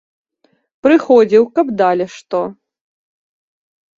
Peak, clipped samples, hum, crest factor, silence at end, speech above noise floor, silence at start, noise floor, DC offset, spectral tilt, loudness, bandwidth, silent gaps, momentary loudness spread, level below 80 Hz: 0 dBFS; under 0.1%; none; 16 dB; 1.45 s; 48 dB; 0.85 s; -61 dBFS; under 0.1%; -6.5 dB/octave; -14 LUFS; 7.6 kHz; none; 11 LU; -60 dBFS